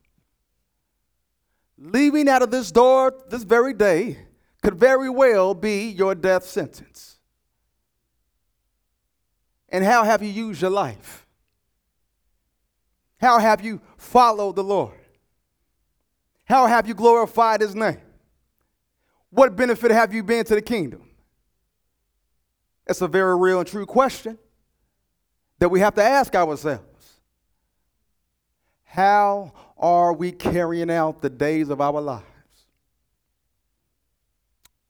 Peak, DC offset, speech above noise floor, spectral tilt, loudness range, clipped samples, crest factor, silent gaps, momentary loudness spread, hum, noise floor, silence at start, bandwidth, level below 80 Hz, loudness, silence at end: 0 dBFS; under 0.1%; 56 dB; -5.5 dB/octave; 7 LU; under 0.1%; 22 dB; none; 12 LU; none; -75 dBFS; 1.85 s; over 20 kHz; -54 dBFS; -19 LUFS; 2.7 s